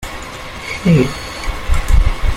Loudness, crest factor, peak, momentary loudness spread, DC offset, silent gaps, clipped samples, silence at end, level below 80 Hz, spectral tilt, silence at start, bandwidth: -17 LUFS; 14 dB; -2 dBFS; 14 LU; under 0.1%; none; under 0.1%; 0 s; -18 dBFS; -6 dB/octave; 0 s; 15.5 kHz